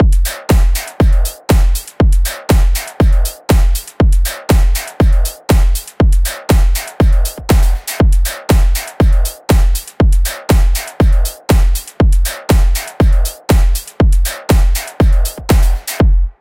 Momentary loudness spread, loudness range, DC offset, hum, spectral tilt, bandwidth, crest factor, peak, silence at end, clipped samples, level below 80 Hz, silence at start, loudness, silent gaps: 4 LU; 0 LU; under 0.1%; none; -5.5 dB/octave; 17 kHz; 10 dB; 0 dBFS; 0.1 s; under 0.1%; -12 dBFS; 0 s; -14 LUFS; none